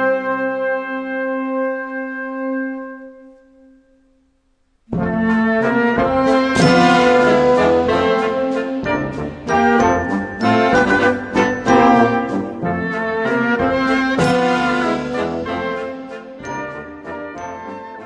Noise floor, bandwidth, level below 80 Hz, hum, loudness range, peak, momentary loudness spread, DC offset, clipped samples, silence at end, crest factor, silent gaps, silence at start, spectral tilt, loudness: -61 dBFS; 10.5 kHz; -44 dBFS; none; 11 LU; 0 dBFS; 16 LU; under 0.1%; under 0.1%; 0 s; 16 dB; none; 0 s; -6 dB/octave; -17 LUFS